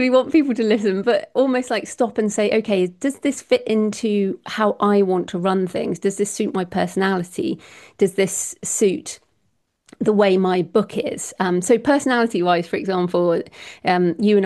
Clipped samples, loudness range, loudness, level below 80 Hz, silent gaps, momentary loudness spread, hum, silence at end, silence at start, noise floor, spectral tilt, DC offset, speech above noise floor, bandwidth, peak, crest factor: under 0.1%; 3 LU; -20 LUFS; -62 dBFS; none; 8 LU; none; 0 s; 0 s; -69 dBFS; -5 dB/octave; under 0.1%; 49 dB; 12.5 kHz; -4 dBFS; 16 dB